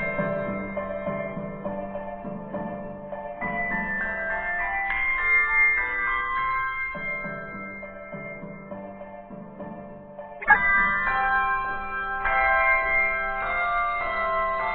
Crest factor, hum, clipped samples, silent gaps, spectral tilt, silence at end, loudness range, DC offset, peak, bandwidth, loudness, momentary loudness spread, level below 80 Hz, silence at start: 24 dB; none; under 0.1%; none; -8.5 dB/octave; 0 s; 10 LU; under 0.1%; -2 dBFS; 4.5 kHz; -24 LUFS; 19 LU; -44 dBFS; 0 s